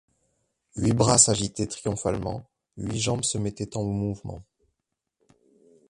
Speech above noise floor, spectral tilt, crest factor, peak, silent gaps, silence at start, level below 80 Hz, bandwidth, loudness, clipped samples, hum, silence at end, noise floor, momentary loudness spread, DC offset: 56 dB; -4 dB/octave; 24 dB; -2 dBFS; none; 0.75 s; -50 dBFS; 11.5 kHz; -24 LUFS; under 0.1%; none; 1.5 s; -82 dBFS; 20 LU; under 0.1%